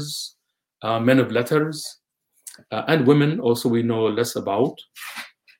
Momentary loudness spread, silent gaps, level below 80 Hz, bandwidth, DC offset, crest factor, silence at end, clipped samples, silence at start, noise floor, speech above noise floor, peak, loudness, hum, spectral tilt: 18 LU; none; -68 dBFS; 17 kHz; under 0.1%; 20 dB; 0.3 s; under 0.1%; 0 s; -47 dBFS; 26 dB; -2 dBFS; -21 LUFS; none; -6 dB/octave